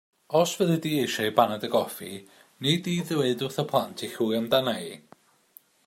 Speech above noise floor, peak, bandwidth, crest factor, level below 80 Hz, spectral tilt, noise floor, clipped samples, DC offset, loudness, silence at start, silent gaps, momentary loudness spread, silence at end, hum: 31 dB; -4 dBFS; 16 kHz; 22 dB; -70 dBFS; -5 dB/octave; -57 dBFS; under 0.1%; under 0.1%; -26 LUFS; 0.3 s; none; 11 LU; 0.9 s; none